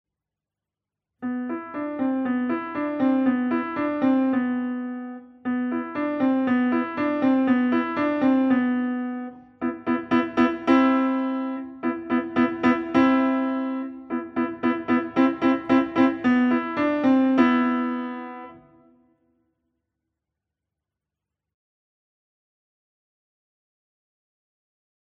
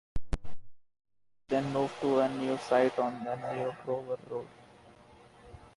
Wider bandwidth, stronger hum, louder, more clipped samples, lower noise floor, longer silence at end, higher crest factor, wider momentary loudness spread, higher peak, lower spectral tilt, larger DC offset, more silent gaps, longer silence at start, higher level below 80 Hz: second, 6 kHz vs 11.5 kHz; neither; first, -23 LUFS vs -32 LUFS; neither; first, -88 dBFS vs -57 dBFS; first, 6.6 s vs 0.1 s; about the same, 18 dB vs 18 dB; about the same, 12 LU vs 14 LU; first, -6 dBFS vs -14 dBFS; about the same, -7.5 dB/octave vs -6.5 dB/octave; neither; neither; first, 1.2 s vs 0.15 s; second, -64 dBFS vs -50 dBFS